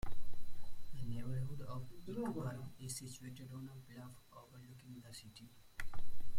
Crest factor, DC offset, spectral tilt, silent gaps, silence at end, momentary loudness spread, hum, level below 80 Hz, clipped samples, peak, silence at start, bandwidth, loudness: 12 dB; under 0.1%; -5.5 dB/octave; none; 0 s; 15 LU; none; -52 dBFS; under 0.1%; -24 dBFS; 0.05 s; 15.5 kHz; -49 LUFS